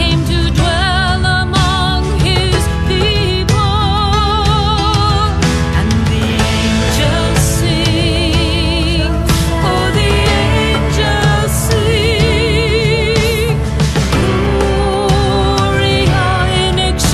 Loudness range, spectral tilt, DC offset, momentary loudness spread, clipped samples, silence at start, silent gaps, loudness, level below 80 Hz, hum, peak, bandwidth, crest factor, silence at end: 1 LU; -5 dB/octave; under 0.1%; 2 LU; under 0.1%; 0 s; none; -13 LUFS; -18 dBFS; none; 0 dBFS; 14 kHz; 12 dB; 0 s